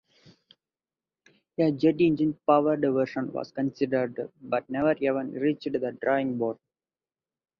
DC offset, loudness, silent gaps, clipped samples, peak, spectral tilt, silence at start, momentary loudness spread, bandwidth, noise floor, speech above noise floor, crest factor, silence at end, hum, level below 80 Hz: under 0.1%; -27 LUFS; none; under 0.1%; -8 dBFS; -8.5 dB/octave; 1.6 s; 10 LU; 6.2 kHz; under -90 dBFS; over 64 dB; 20 dB; 1.05 s; none; -68 dBFS